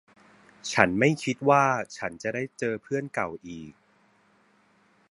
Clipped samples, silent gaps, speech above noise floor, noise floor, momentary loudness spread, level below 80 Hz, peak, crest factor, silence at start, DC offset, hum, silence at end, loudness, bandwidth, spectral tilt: under 0.1%; none; 37 dB; -63 dBFS; 18 LU; -62 dBFS; 0 dBFS; 28 dB; 0.65 s; under 0.1%; none; 1.4 s; -26 LUFS; 11.5 kHz; -5 dB/octave